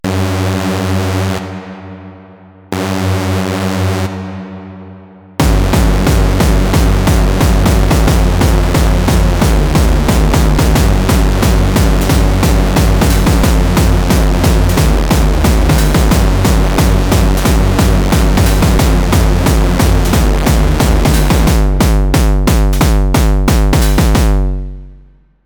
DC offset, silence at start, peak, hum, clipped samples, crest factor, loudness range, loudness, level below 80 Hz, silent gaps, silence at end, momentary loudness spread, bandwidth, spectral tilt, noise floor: under 0.1%; 0.05 s; 0 dBFS; none; under 0.1%; 10 dB; 6 LU; -12 LUFS; -12 dBFS; none; 0.5 s; 6 LU; over 20 kHz; -5.5 dB/octave; -42 dBFS